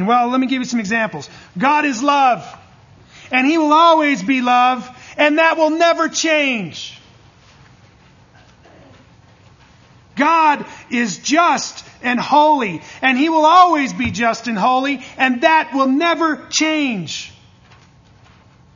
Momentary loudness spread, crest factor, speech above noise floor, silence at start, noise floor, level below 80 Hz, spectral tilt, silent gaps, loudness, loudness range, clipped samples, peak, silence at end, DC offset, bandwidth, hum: 12 LU; 16 dB; 33 dB; 0 s; -48 dBFS; -56 dBFS; -3.5 dB/octave; none; -15 LUFS; 7 LU; under 0.1%; 0 dBFS; 1.45 s; under 0.1%; 7.4 kHz; none